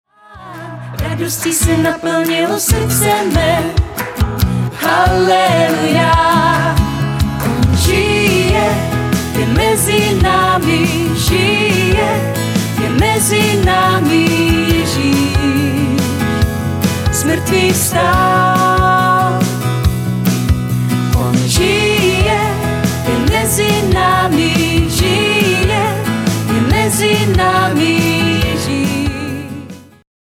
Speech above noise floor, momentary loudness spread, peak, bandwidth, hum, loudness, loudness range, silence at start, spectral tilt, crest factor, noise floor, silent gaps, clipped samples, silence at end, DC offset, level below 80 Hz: 23 dB; 5 LU; 0 dBFS; 17.5 kHz; none; -13 LUFS; 2 LU; 0.3 s; -4.5 dB/octave; 12 dB; -35 dBFS; none; under 0.1%; 0.4 s; under 0.1%; -26 dBFS